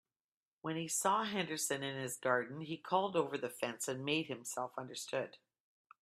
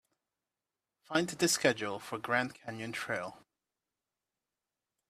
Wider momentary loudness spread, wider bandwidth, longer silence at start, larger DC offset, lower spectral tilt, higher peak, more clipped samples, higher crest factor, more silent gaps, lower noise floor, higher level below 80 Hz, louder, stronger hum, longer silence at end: second, 9 LU vs 12 LU; about the same, 15.5 kHz vs 14.5 kHz; second, 0.65 s vs 1.1 s; neither; about the same, -3 dB/octave vs -3 dB/octave; second, -18 dBFS vs -10 dBFS; neither; second, 20 dB vs 28 dB; neither; about the same, under -90 dBFS vs under -90 dBFS; second, -84 dBFS vs -76 dBFS; second, -38 LUFS vs -33 LUFS; neither; second, 0.65 s vs 1.7 s